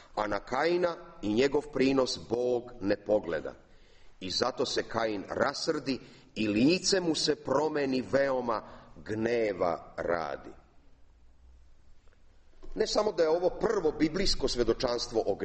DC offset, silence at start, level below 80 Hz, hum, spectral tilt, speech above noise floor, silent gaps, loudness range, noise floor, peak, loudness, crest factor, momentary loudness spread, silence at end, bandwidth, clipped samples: under 0.1%; 0 s; -48 dBFS; none; -4 dB/octave; 27 dB; none; 6 LU; -56 dBFS; -10 dBFS; -30 LUFS; 20 dB; 9 LU; 0 s; 8.4 kHz; under 0.1%